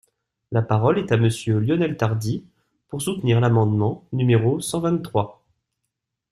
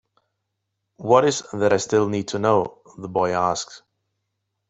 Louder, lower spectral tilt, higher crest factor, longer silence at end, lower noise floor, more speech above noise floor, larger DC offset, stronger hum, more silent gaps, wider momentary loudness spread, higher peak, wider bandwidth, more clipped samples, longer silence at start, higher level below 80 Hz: about the same, -21 LUFS vs -21 LUFS; first, -7 dB/octave vs -4.5 dB/octave; about the same, 18 dB vs 20 dB; about the same, 1 s vs 0.9 s; about the same, -80 dBFS vs -78 dBFS; about the same, 60 dB vs 58 dB; neither; neither; neither; second, 9 LU vs 15 LU; about the same, -4 dBFS vs -2 dBFS; first, 13.5 kHz vs 8.4 kHz; neither; second, 0.5 s vs 1 s; first, -54 dBFS vs -62 dBFS